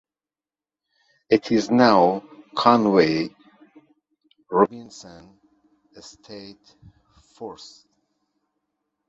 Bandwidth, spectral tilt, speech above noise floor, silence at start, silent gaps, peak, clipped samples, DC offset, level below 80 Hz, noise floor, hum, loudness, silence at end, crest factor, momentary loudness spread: 7.8 kHz; -6 dB/octave; over 69 dB; 1.3 s; none; -2 dBFS; under 0.1%; under 0.1%; -64 dBFS; under -90 dBFS; none; -20 LUFS; 1.55 s; 22 dB; 24 LU